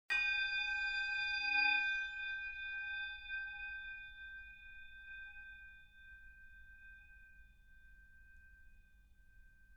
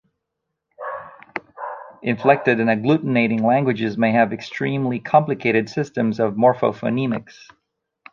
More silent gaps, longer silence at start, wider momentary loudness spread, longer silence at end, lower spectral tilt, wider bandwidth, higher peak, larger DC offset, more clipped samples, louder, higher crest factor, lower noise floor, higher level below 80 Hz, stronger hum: neither; second, 0.1 s vs 0.8 s; first, 25 LU vs 16 LU; second, 0 s vs 0.9 s; second, -0.5 dB/octave vs -7.5 dB/octave; first, 9 kHz vs 7.2 kHz; second, -22 dBFS vs -2 dBFS; neither; neither; second, -37 LUFS vs -19 LUFS; about the same, 20 dB vs 20 dB; second, -65 dBFS vs -79 dBFS; about the same, -64 dBFS vs -64 dBFS; neither